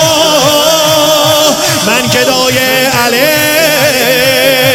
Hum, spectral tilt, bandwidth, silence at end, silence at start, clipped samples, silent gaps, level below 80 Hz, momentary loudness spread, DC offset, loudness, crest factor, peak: none; -2.5 dB/octave; over 20 kHz; 0 s; 0 s; 0.5%; none; -42 dBFS; 2 LU; 0.3%; -7 LUFS; 8 dB; 0 dBFS